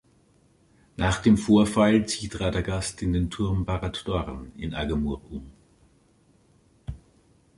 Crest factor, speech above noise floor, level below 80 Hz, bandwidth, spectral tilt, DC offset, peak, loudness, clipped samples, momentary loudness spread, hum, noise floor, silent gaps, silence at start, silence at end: 20 dB; 37 dB; -40 dBFS; 11.5 kHz; -6 dB/octave; under 0.1%; -6 dBFS; -25 LUFS; under 0.1%; 21 LU; none; -61 dBFS; none; 1 s; 0.6 s